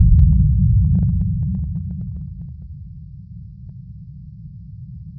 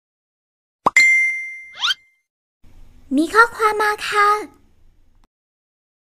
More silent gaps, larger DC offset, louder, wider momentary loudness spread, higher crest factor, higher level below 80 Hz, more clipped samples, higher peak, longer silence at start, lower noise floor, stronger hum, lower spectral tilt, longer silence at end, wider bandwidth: second, none vs 2.30-2.60 s; neither; about the same, -18 LUFS vs -16 LUFS; first, 23 LU vs 13 LU; about the same, 16 dB vs 20 dB; first, -22 dBFS vs -52 dBFS; neither; about the same, -2 dBFS vs 0 dBFS; second, 0 s vs 0.85 s; second, -36 dBFS vs -51 dBFS; neither; first, -14.5 dB/octave vs -1.5 dB/octave; second, 0.05 s vs 1.65 s; second, 0.9 kHz vs 15.5 kHz